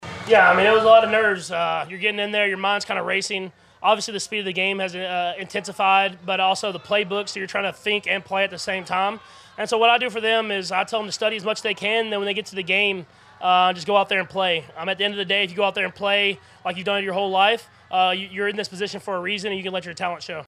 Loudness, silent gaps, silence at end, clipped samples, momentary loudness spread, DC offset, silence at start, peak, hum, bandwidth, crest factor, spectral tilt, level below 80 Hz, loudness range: -21 LUFS; none; 0 s; under 0.1%; 10 LU; under 0.1%; 0 s; -2 dBFS; none; 13 kHz; 20 dB; -3 dB/octave; -66 dBFS; 3 LU